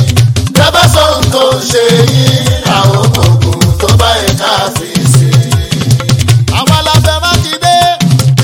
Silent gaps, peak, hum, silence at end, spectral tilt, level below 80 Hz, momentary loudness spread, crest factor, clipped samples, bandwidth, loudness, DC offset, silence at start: none; 0 dBFS; none; 0 s; -4.5 dB/octave; -24 dBFS; 3 LU; 8 dB; 4%; 17.5 kHz; -8 LUFS; under 0.1%; 0 s